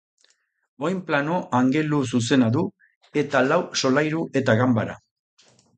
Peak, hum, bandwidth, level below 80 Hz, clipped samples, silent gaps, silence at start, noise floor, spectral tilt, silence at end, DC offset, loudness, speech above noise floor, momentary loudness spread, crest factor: -4 dBFS; none; 9 kHz; -62 dBFS; under 0.1%; 2.96-3.01 s; 0.8 s; -65 dBFS; -5.5 dB/octave; 0.8 s; under 0.1%; -22 LUFS; 43 dB; 9 LU; 18 dB